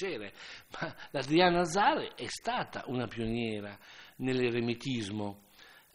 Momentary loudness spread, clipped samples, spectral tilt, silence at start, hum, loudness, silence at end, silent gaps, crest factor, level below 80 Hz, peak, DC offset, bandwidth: 19 LU; under 0.1%; -5 dB/octave; 0 s; none; -32 LUFS; 0.2 s; none; 22 dB; -58 dBFS; -12 dBFS; under 0.1%; 16 kHz